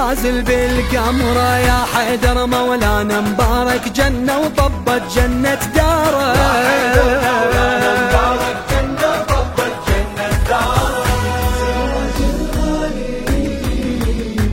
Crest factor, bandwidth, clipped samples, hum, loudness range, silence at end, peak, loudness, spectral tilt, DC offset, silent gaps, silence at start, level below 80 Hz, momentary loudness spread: 14 dB; 16.5 kHz; under 0.1%; none; 4 LU; 0 s; 0 dBFS; -16 LUFS; -5 dB/octave; under 0.1%; none; 0 s; -22 dBFS; 6 LU